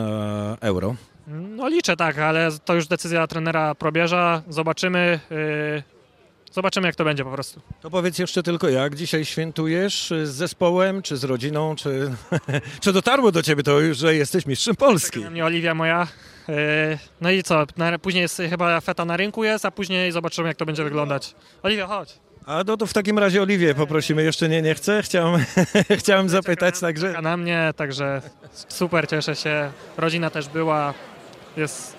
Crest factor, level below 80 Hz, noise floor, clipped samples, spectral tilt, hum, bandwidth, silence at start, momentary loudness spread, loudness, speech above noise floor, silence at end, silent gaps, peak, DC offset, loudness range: 18 dB; -60 dBFS; -55 dBFS; under 0.1%; -5 dB/octave; none; 15.5 kHz; 0 s; 9 LU; -21 LUFS; 34 dB; 0 s; none; -4 dBFS; under 0.1%; 5 LU